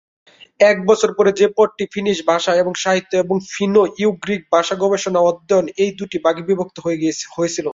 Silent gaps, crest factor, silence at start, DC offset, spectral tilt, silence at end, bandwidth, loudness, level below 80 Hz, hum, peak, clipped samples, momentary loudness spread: none; 16 dB; 0.6 s; under 0.1%; -4.5 dB/octave; 0 s; 7.8 kHz; -17 LUFS; -60 dBFS; none; -2 dBFS; under 0.1%; 6 LU